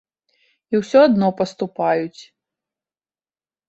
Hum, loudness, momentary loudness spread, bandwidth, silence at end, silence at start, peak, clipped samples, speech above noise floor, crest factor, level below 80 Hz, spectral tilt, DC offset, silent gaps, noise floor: none; -18 LUFS; 10 LU; 8 kHz; 1.45 s; 0.7 s; -2 dBFS; under 0.1%; over 73 dB; 18 dB; -64 dBFS; -6.5 dB/octave; under 0.1%; none; under -90 dBFS